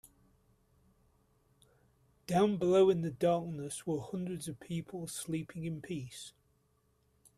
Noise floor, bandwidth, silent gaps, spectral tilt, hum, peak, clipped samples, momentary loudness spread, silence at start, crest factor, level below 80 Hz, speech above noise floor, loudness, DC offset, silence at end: -74 dBFS; 14 kHz; none; -6 dB/octave; none; -16 dBFS; under 0.1%; 15 LU; 2.3 s; 20 dB; -68 dBFS; 40 dB; -34 LUFS; under 0.1%; 1.1 s